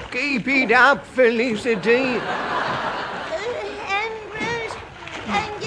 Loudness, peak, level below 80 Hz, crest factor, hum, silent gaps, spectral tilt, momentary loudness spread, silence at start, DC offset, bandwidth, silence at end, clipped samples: -20 LUFS; -2 dBFS; -52 dBFS; 20 dB; none; none; -4.5 dB/octave; 12 LU; 0 s; under 0.1%; 10.5 kHz; 0 s; under 0.1%